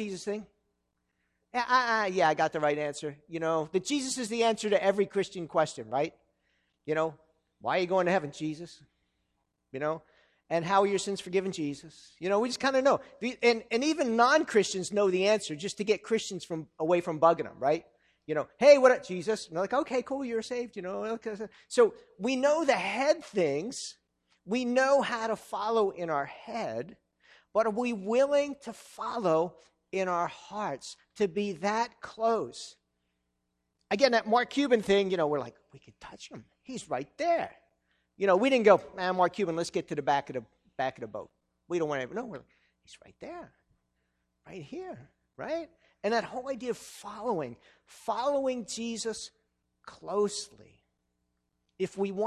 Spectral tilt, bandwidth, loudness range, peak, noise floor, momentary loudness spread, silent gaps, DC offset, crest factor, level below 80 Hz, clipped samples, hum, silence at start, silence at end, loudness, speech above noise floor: -4.5 dB/octave; 12.5 kHz; 9 LU; -6 dBFS; -80 dBFS; 17 LU; none; under 0.1%; 24 dB; -70 dBFS; under 0.1%; none; 0 s; 0 s; -29 LUFS; 51 dB